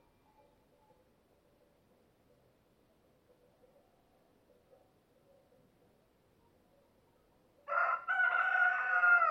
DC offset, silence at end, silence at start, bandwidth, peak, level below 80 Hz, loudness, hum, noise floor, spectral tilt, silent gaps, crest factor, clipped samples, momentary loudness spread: under 0.1%; 0 s; 7.7 s; 6.2 kHz; -18 dBFS; -82 dBFS; -30 LUFS; none; -71 dBFS; -2.5 dB/octave; none; 20 dB; under 0.1%; 7 LU